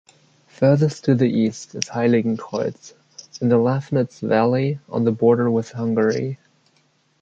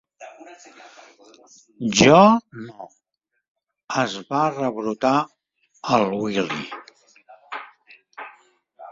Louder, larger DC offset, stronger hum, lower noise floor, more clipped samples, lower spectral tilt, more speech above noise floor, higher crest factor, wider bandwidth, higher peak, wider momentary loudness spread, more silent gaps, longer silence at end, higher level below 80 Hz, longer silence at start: about the same, -20 LUFS vs -19 LUFS; neither; neither; second, -62 dBFS vs -78 dBFS; neither; first, -7 dB/octave vs -4.5 dB/octave; second, 43 dB vs 57 dB; about the same, 20 dB vs 22 dB; about the same, 7.8 kHz vs 7.8 kHz; about the same, 0 dBFS vs 0 dBFS; second, 9 LU vs 26 LU; second, none vs 3.48-3.55 s, 3.84-3.88 s; first, 0.85 s vs 0 s; about the same, -62 dBFS vs -58 dBFS; first, 0.6 s vs 0.2 s